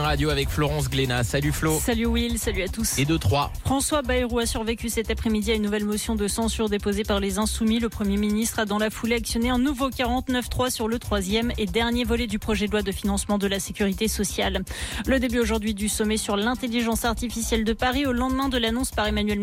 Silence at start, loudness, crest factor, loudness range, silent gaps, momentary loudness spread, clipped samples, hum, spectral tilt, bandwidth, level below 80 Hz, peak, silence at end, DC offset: 0 s; -24 LUFS; 12 dB; 1 LU; none; 3 LU; under 0.1%; none; -4.5 dB/octave; 16.5 kHz; -34 dBFS; -12 dBFS; 0 s; under 0.1%